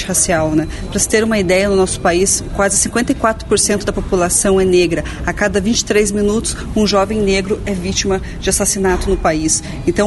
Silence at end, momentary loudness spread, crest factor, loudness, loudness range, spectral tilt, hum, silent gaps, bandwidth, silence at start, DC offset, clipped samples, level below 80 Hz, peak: 0 s; 6 LU; 14 dB; -15 LUFS; 2 LU; -3.5 dB/octave; none; none; 12 kHz; 0 s; under 0.1%; under 0.1%; -28 dBFS; 0 dBFS